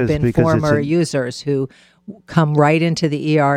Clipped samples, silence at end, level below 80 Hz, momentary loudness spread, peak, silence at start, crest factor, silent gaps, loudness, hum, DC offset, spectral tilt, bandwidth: under 0.1%; 0 s; -42 dBFS; 7 LU; 0 dBFS; 0 s; 16 dB; none; -17 LUFS; none; under 0.1%; -7 dB/octave; 11.5 kHz